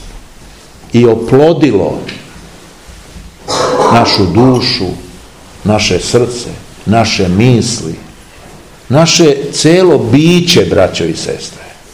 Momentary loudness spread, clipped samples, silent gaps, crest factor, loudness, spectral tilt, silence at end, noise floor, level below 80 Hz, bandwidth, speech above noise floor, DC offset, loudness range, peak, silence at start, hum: 15 LU; 2%; none; 10 dB; -9 LUFS; -5 dB/octave; 0.2 s; -35 dBFS; -36 dBFS; 17 kHz; 26 dB; 0.5%; 4 LU; 0 dBFS; 0 s; none